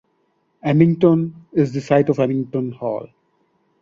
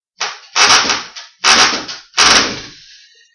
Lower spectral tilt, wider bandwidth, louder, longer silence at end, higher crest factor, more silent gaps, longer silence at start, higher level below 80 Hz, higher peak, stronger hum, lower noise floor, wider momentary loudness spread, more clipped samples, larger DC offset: first, -9 dB/octave vs 0.5 dB/octave; second, 7.4 kHz vs 12 kHz; second, -19 LUFS vs -10 LUFS; about the same, 0.75 s vs 0.65 s; about the same, 18 dB vs 14 dB; neither; first, 0.65 s vs 0.2 s; second, -58 dBFS vs -46 dBFS; about the same, -2 dBFS vs 0 dBFS; neither; first, -66 dBFS vs -44 dBFS; about the same, 12 LU vs 14 LU; second, under 0.1% vs 0.2%; neither